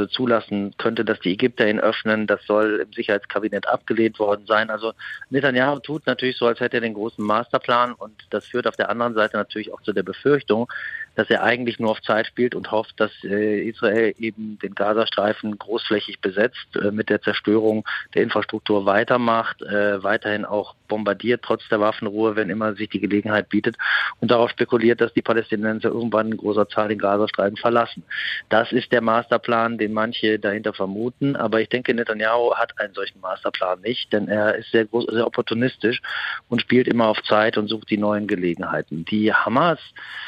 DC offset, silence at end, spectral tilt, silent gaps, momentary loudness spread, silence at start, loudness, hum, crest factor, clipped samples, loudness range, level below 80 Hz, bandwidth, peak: under 0.1%; 0 s; -7 dB/octave; none; 7 LU; 0 s; -21 LUFS; none; 18 dB; under 0.1%; 2 LU; -64 dBFS; 8.4 kHz; -4 dBFS